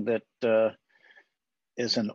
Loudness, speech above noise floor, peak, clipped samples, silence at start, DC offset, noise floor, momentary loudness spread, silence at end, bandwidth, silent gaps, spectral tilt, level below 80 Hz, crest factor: -28 LUFS; 58 dB; -14 dBFS; under 0.1%; 0 s; under 0.1%; -85 dBFS; 9 LU; 0 s; 7.6 kHz; none; -4.5 dB/octave; -80 dBFS; 16 dB